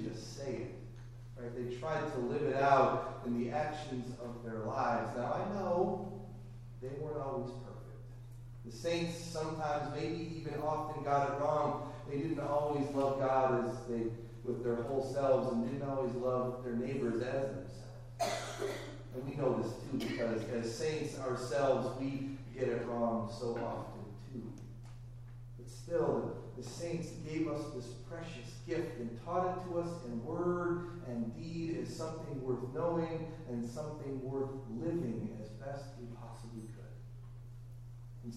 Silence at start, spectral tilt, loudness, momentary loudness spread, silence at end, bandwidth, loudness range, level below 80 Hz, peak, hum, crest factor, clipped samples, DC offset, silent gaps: 0 s; -6.5 dB/octave; -37 LUFS; 16 LU; 0 s; 14.5 kHz; 7 LU; -56 dBFS; -14 dBFS; none; 24 dB; under 0.1%; under 0.1%; none